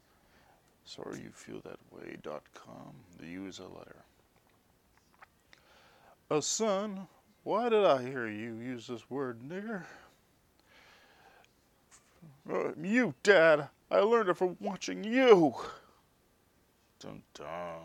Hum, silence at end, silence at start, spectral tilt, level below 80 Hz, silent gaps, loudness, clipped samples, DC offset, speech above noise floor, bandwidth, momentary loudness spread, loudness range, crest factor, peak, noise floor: none; 0 s; 0.85 s; -4 dB/octave; -74 dBFS; none; -30 LUFS; under 0.1%; under 0.1%; 38 dB; 13 kHz; 26 LU; 21 LU; 26 dB; -8 dBFS; -69 dBFS